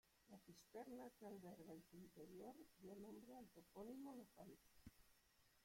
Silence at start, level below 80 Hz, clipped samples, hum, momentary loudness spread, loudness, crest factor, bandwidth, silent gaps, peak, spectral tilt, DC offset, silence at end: 0.05 s; -84 dBFS; under 0.1%; none; 10 LU; -62 LUFS; 16 dB; 16.5 kHz; none; -44 dBFS; -6 dB/octave; under 0.1%; 0 s